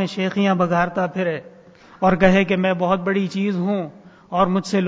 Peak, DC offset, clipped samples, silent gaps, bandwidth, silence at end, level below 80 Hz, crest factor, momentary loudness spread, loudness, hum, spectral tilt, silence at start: -2 dBFS; under 0.1%; under 0.1%; none; 7.8 kHz; 0 s; -48 dBFS; 18 dB; 10 LU; -20 LUFS; none; -7 dB/octave; 0 s